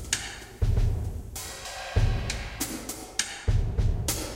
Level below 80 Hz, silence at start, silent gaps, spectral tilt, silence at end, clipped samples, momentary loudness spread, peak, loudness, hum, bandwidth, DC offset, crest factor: -30 dBFS; 0 s; none; -3.5 dB/octave; 0 s; under 0.1%; 9 LU; -6 dBFS; -30 LUFS; none; 16 kHz; under 0.1%; 22 dB